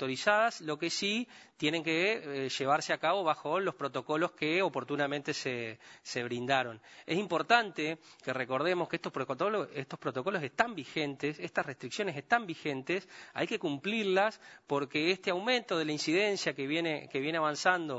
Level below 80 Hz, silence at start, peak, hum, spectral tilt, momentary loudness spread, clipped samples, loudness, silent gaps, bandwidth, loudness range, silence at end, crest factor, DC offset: -80 dBFS; 0 s; -8 dBFS; none; -4 dB/octave; 8 LU; under 0.1%; -32 LUFS; none; 8 kHz; 3 LU; 0 s; 24 dB; under 0.1%